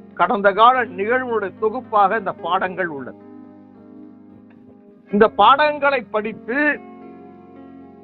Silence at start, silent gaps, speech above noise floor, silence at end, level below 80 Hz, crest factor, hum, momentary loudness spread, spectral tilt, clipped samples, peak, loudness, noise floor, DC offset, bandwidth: 0.15 s; none; 28 dB; 0.15 s; -58 dBFS; 18 dB; none; 12 LU; -9 dB/octave; under 0.1%; -2 dBFS; -18 LUFS; -46 dBFS; under 0.1%; 4.7 kHz